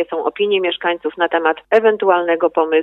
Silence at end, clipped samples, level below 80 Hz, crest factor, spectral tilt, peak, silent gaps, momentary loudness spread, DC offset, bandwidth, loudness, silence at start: 0 s; under 0.1%; -64 dBFS; 14 dB; -6 dB/octave; -2 dBFS; none; 5 LU; under 0.1%; 5.4 kHz; -16 LUFS; 0 s